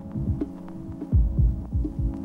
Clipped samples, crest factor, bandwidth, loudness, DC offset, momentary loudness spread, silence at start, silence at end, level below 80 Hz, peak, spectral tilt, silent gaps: under 0.1%; 14 dB; 2.2 kHz; -27 LUFS; under 0.1%; 13 LU; 0 s; 0 s; -28 dBFS; -10 dBFS; -11.5 dB/octave; none